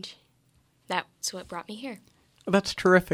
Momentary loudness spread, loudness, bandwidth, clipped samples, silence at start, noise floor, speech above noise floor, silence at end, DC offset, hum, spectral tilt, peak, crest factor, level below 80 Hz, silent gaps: 19 LU; -28 LUFS; 16 kHz; under 0.1%; 0.05 s; -66 dBFS; 39 dB; 0 s; under 0.1%; none; -4.5 dB/octave; -8 dBFS; 22 dB; -60 dBFS; none